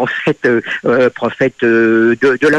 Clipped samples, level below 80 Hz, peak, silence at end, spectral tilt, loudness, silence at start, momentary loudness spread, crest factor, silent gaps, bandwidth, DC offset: under 0.1%; -54 dBFS; -2 dBFS; 0 s; -6.5 dB/octave; -13 LUFS; 0 s; 5 LU; 10 dB; none; 9 kHz; under 0.1%